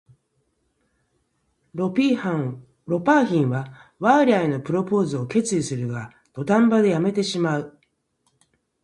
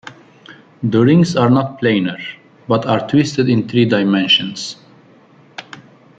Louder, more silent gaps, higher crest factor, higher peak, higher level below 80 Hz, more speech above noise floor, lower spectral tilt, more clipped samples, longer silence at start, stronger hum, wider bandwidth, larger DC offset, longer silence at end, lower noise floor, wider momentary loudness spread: second, -21 LUFS vs -15 LUFS; neither; about the same, 18 dB vs 14 dB; about the same, -4 dBFS vs -2 dBFS; second, -64 dBFS vs -56 dBFS; first, 50 dB vs 33 dB; about the same, -6 dB/octave vs -6 dB/octave; neither; first, 1.75 s vs 0.05 s; neither; first, 11.5 kHz vs 9 kHz; neither; first, 1.15 s vs 0.4 s; first, -70 dBFS vs -47 dBFS; second, 14 LU vs 20 LU